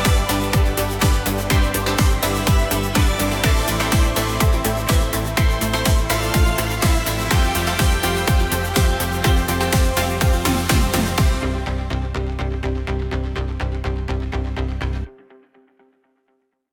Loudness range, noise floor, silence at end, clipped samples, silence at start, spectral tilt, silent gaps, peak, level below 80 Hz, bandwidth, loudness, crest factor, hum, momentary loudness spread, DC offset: 7 LU; -68 dBFS; 1.65 s; under 0.1%; 0 s; -4.5 dB/octave; none; -4 dBFS; -22 dBFS; 19 kHz; -19 LUFS; 16 dB; none; 7 LU; under 0.1%